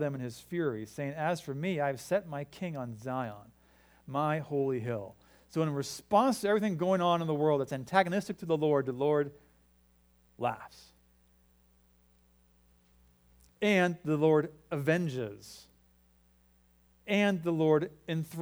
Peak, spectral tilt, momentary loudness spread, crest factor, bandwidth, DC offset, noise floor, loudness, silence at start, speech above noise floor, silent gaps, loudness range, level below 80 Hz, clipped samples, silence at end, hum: -10 dBFS; -6.5 dB/octave; 12 LU; 24 dB; over 20 kHz; under 0.1%; -66 dBFS; -31 LUFS; 0 s; 35 dB; none; 8 LU; -68 dBFS; under 0.1%; 0 s; none